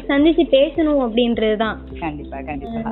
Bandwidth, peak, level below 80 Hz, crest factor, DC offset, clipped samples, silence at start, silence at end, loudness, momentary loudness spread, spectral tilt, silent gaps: 4.2 kHz; -2 dBFS; -38 dBFS; 16 dB; under 0.1%; under 0.1%; 0 s; 0 s; -18 LUFS; 13 LU; -9.5 dB/octave; none